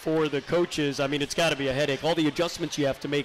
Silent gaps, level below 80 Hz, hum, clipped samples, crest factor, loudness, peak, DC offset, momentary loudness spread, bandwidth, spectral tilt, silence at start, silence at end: none; -54 dBFS; none; under 0.1%; 10 dB; -26 LUFS; -16 dBFS; under 0.1%; 3 LU; 15.5 kHz; -4.5 dB/octave; 0 s; 0 s